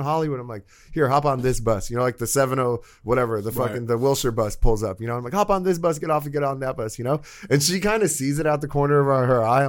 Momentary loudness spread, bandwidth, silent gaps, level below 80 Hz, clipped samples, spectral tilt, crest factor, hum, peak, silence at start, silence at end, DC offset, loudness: 8 LU; 17 kHz; none; -34 dBFS; under 0.1%; -5 dB/octave; 18 dB; none; -4 dBFS; 0 s; 0 s; under 0.1%; -22 LUFS